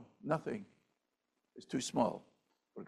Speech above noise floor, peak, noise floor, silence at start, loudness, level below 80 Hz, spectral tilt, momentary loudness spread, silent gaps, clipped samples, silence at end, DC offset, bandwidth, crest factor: 48 dB; -18 dBFS; -85 dBFS; 0 s; -38 LUFS; -78 dBFS; -5 dB/octave; 19 LU; none; under 0.1%; 0 s; under 0.1%; 13.5 kHz; 22 dB